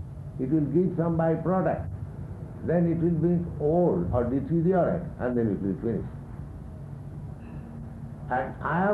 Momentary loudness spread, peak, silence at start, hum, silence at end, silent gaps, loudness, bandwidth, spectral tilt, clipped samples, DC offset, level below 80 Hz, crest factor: 16 LU; -12 dBFS; 0 s; none; 0 s; none; -27 LUFS; 3.7 kHz; -11 dB/octave; under 0.1%; under 0.1%; -46 dBFS; 14 dB